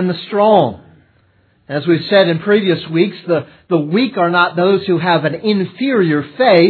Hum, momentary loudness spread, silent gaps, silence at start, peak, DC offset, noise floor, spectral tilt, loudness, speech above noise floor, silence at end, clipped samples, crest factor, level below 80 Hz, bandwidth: none; 7 LU; none; 0 s; 0 dBFS; under 0.1%; -55 dBFS; -9.5 dB/octave; -14 LUFS; 41 dB; 0 s; under 0.1%; 14 dB; -62 dBFS; 4.6 kHz